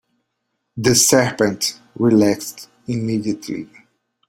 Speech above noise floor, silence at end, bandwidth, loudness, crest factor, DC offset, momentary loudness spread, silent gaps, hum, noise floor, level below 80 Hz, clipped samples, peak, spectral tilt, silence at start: 56 dB; 0.65 s; 16.5 kHz; -17 LUFS; 18 dB; under 0.1%; 17 LU; none; none; -74 dBFS; -56 dBFS; under 0.1%; -2 dBFS; -4 dB/octave; 0.75 s